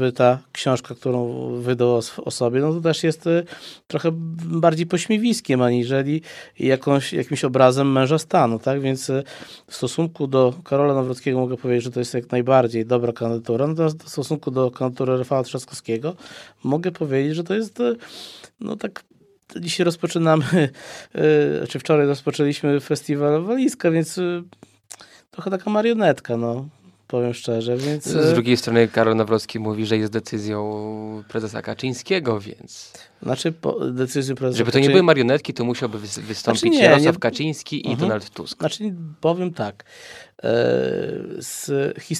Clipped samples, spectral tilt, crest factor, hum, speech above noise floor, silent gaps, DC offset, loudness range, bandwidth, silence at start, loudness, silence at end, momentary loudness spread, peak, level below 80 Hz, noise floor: under 0.1%; -6 dB/octave; 20 dB; none; 24 dB; none; under 0.1%; 6 LU; 14.5 kHz; 0 s; -21 LUFS; 0 s; 13 LU; 0 dBFS; -66 dBFS; -45 dBFS